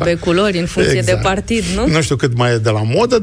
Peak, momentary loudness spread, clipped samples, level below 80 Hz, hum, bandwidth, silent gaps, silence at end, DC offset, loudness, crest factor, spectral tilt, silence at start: -2 dBFS; 2 LU; under 0.1%; -32 dBFS; none; 13.5 kHz; none; 0 s; under 0.1%; -15 LUFS; 12 dB; -5.5 dB/octave; 0 s